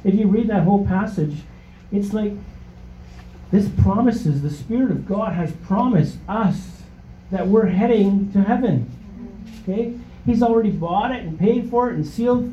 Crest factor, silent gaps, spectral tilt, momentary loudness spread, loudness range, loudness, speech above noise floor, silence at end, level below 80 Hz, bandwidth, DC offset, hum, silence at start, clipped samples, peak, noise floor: 16 dB; none; -9 dB/octave; 12 LU; 3 LU; -20 LUFS; 22 dB; 0 s; -40 dBFS; 8.2 kHz; under 0.1%; 60 Hz at -45 dBFS; 0.05 s; under 0.1%; -4 dBFS; -40 dBFS